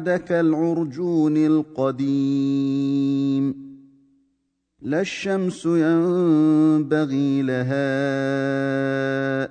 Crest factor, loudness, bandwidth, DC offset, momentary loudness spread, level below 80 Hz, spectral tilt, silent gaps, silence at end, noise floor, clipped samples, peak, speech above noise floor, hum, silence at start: 12 dB; -21 LUFS; 9.2 kHz; under 0.1%; 6 LU; -66 dBFS; -7.5 dB/octave; none; 0 s; -72 dBFS; under 0.1%; -8 dBFS; 52 dB; none; 0 s